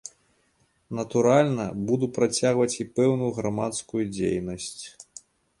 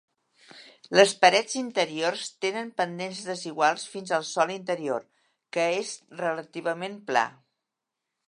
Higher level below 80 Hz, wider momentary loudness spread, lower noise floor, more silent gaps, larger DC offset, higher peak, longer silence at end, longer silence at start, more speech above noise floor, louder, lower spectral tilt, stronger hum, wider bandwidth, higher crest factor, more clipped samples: first, -58 dBFS vs -84 dBFS; first, 17 LU vs 13 LU; second, -67 dBFS vs -85 dBFS; neither; neither; second, -6 dBFS vs -2 dBFS; second, 0.7 s vs 1 s; second, 0.05 s vs 0.55 s; second, 43 dB vs 59 dB; about the same, -25 LUFS vs -26 LUFS; first, -5.5 dB/octave vs -3 dB/octave; neither; about the same, 11.5 kHz vs 11.5 kHz; second, 20 dB vs 26 dB; neither